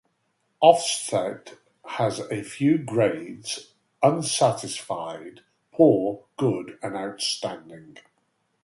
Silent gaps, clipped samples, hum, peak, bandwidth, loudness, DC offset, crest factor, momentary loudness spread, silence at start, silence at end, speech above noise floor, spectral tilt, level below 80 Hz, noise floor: none; under 0.1%; none; -2 dBFS; 11.5 kHz; -24 LUFS; under 0.1%; 24 dB; 15 LU; 0.6 s; 0.75 s; 48 dB; -4.5 dB/octave; -68 dBFS; -72 dBFS